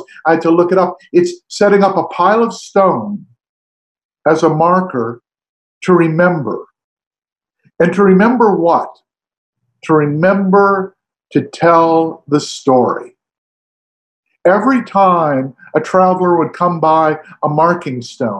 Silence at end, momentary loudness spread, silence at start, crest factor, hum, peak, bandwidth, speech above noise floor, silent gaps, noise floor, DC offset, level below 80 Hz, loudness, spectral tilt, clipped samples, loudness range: 0 s; 9 LU; 0 s; 14 dB; none; 0 dBFS; 9.6 kHz; over 78 dB; 3.49-3.95 s, 4.05-4.09 s, 5.49-5.81 s, 6.84-6.97 s, 7.07-7.11 s, 9.37-9.53 s, 13.38-14.23 s; under -90 dBFS; under 0.1%; -60 dBFS; -13 LUFS; -7 dB/octave; under 0.1%; 3 LU